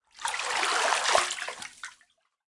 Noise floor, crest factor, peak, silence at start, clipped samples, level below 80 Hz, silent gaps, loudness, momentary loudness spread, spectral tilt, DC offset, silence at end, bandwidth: -67 dBFS; 22 dB; -8 dBFS; 0.15 s; under 0.1%; -68 dBFS; none; -27 LUFS; 18 LU; 1.5 dB/octave; under 0.1%; 0.6 s; 11.5 kHz